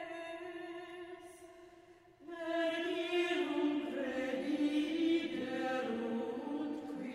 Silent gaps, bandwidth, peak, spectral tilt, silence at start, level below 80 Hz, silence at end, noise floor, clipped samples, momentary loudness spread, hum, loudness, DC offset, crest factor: none; 12.5 kHz; -22 dBFS; -4.5 dB/octave; 0 s; -76 dBFS; 0 s; -61 dBFS; under 0.1%; 17 LU; none; -37 LUFS; under 0.1%; 16 dB